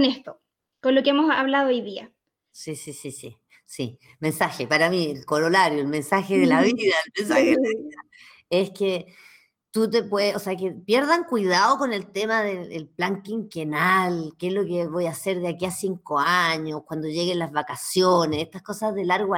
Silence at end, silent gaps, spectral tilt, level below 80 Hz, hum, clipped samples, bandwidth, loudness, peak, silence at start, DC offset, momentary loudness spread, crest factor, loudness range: 0 s; none; -4.5 dB/octave; -68 dBFS; none; under 0.1%; 17.5 kHz; -23 LUFS; -6 dBFS; 0 s; under 0.1%; 14 LU; 18 dB; 5 LU